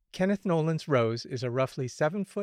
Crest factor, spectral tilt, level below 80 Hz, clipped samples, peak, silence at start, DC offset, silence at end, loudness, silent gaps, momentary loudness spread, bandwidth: 16 dB; -6.5 dB/octave; -68 dBFS; under 0.1%; -14 dBFS; 0.15 s; under 0.1%; 0 s; -29 LUFS; none; 5 LU; 13 kHz